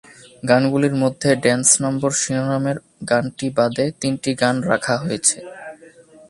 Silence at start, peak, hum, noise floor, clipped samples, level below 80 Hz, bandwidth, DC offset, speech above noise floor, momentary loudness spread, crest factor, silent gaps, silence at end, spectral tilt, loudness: 0.45 s; 0 dBFS; none; -46 dBFS; under 0.1%; -58 dBFS; 11.5 kHz; under 0.1%; 27 dB; 12 LU; 20 dB; none; 0.55 s; -4 dB/octave; -19 LUFS